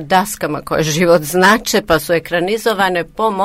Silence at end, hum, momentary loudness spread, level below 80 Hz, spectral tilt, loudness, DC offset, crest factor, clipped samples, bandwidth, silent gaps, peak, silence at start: 0 s; none; 7 LU; -42 dBFS; -4 dB/octave; -14 LUFS; under 0.1%; 14 dB; under 0.1%; 16 kHz; none; 0 dBFS; 0 s